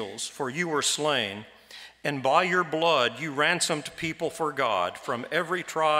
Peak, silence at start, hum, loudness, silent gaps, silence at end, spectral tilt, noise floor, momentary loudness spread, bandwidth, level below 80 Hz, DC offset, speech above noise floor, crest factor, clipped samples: -6 dBFS; 0 s; none; -26 LUFS; none; 0 s; -2.5 dB/octave; -48 dBFS; 10 LU; 16 kHz; -68 dBFS; under 0.1%; 22 dB; 22 dB; under 0.1%